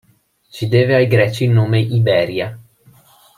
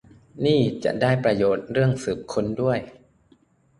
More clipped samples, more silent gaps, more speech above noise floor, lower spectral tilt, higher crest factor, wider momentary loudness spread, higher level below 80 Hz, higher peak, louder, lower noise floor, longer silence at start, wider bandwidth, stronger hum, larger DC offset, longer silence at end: neither; neither; about the same, 41 dB vs 38 dB; about the same, -7.5 dB/octave vs -7 dB/octave; about the same, 14 dB vs 18 dB; first, 11 LU vs 6 LU; about the same, -54 dBFS vs -52 dBFS; first, -2 dBFS vs -6 dBFS; first, -15 LUFS vs -23 LUFS; second, -56 dBFS vs -60 dBFS; first, 0.55 s vs 0.35 s; first, 13 kHz vs 11.5 kHz; neither; neither; second, 0.75 s vs 0.9 s